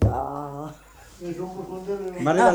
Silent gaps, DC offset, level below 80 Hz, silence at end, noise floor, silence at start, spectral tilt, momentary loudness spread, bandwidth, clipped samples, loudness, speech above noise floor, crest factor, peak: none; under 0.1%; -38 dBFS; 0 s; -47 dBFS; 0 s; -7 dB/octave; 16 LU; over 20 kHz; under 0.1%; -28 LUFS; 24 dB; 20 dB; -6 dBFS